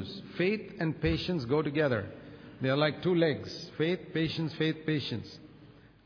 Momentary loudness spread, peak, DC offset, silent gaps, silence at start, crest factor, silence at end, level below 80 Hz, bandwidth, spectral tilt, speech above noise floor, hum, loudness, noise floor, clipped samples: 13 LU; -14 dBFS; under 0.1%; none; 0 s; 18 dB; 0.35 s; -54 dBFS; 5.4 kHz; -7.5 dB/octave; 25 dB; none; -31 LUFS; -55 dBFS; under 0.1%